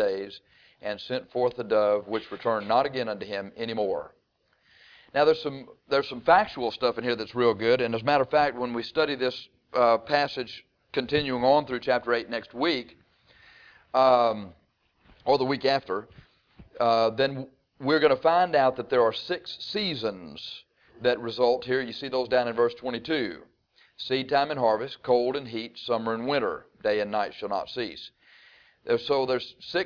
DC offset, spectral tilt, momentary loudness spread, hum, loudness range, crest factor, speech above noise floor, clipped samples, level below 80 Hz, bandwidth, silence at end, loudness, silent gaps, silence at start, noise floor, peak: under 0.1%; -6 dB/octave; 13 LU; none; 4 LU; 20 dB; 44 dB; under 0.1%; -64 dBFS; 5.4 kHz; 0 s; -26 LUFS; none; 0 s; -70 dBFS; -8 dBFS